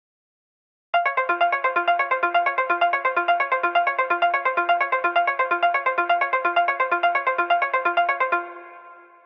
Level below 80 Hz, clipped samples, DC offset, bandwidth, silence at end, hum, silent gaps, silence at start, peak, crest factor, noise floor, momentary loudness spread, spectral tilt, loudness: -84 dBFS; under 0.1%; under 0.1%; 5.8 kHz; 0.25 s; none; none; 0.95 s; -8 dBFS; 14 dB; -46 dBFS; 2 LU; -3.5 dB/octave; -21 LUFS